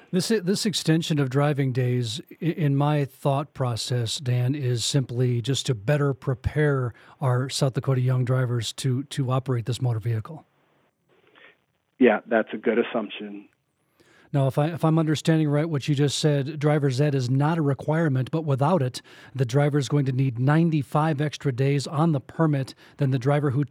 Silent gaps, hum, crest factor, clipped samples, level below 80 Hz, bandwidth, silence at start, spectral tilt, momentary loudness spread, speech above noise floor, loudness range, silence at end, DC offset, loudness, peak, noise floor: none; none; 18 dB; under 0.1%; -56 dBFS; 15 kHz; 0.1 s; -6 dB/octave; 6 LU; 44 dB; 4 LU; 0.05 s; under 0.1%; -24 LUFS; -6 dBFS; -67 dBFS